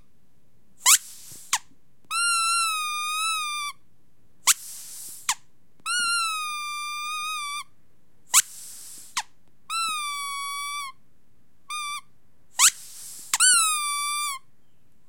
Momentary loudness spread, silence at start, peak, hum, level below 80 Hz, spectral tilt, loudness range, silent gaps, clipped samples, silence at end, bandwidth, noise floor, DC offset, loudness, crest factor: 19 LU; 0.8 s; -2 dBFS; none; -74 dBFS; 4 dB/octave; 9 LU; none; under 0.1%; 0.7 s; 16.5 kHz; -66 dBFS; 0.5%; -23 LUFS; 26 dB